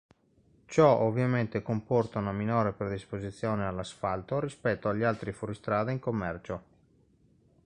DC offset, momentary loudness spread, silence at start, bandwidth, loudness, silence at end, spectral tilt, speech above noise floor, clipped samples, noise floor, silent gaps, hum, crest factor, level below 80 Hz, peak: under 0.1%; 12 LU; 0.7 s; 10 kHz; -30 LUFS; 1.05 s; -7.5 dB/octave; 36 dB; under 0.1%; -65 dBFS; none; none; 22 dB; -56 dBFS; -10 dBFS